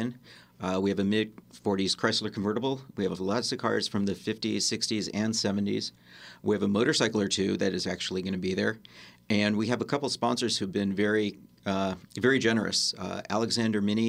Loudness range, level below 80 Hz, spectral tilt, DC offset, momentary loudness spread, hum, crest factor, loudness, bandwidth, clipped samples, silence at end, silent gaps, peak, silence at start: 2 LU; -66 dBFS; -4 dB/octave; under 0.1%; 7 LU; none; 20 dB; -28 LUFS; 15.5 kHz; under 0.1%; 0 s; none; -10 dBFS; 0 s